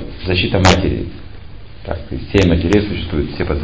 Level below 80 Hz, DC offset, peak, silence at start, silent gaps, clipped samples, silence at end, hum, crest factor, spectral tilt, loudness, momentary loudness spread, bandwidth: -26 dBFS; 2%; 0 dBFS; 0 s; none; under 0.1%; 0 s; none; 16 dB; -6 dB/octave; -16 LUFS; 17 LU; 8 kHz